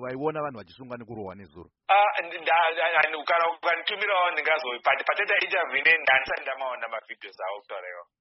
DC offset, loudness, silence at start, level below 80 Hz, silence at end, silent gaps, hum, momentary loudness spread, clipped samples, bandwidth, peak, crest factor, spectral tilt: under 0.1%; -24 LUFS; 0 s; -70 dBFS; 0.2 s; none; none; 18 LU; under 0.1%; 5.8 kHz; -6 dBFS; 20 dB; 0.5 dB/octave